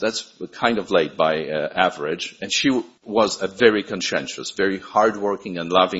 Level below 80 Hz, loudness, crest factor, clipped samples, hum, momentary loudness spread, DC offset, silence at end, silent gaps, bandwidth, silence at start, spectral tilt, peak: -60 dBFS; -21 LUFS; 22 dB; under 0.1%; none; 9 LU; under 0.1%; 0 s; none; 8 kHz; 0 s; -3.5 dB/octave; 0 dBFS